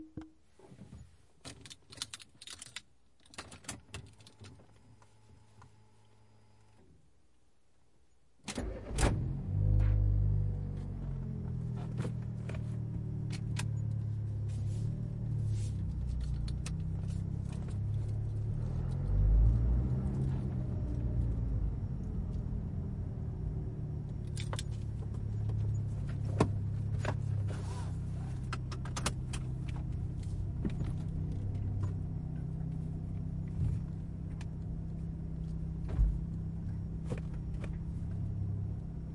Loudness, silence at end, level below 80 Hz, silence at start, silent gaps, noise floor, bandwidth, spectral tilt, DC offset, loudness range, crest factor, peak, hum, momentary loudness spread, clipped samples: -37 LUFS; 0 s; -40 dBFS; 0 s; none; -72 dBFS; 11.5 kHz; -6.5 dB/octave; under 0.1%; 14 LU; 24 dB; -12 dBFS; none; 13 LU; under 0.1%